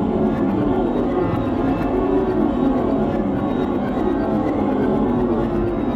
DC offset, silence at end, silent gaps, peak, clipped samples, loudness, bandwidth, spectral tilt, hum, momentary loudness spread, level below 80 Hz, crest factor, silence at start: under 0.1%; 0 s; none; -6 dBFS; under 0.1%; -20 LUFS; 7.6 kHz; -9.5 dB/octave; none; 2 LU; -34 dBFS; 12 dB; 0 s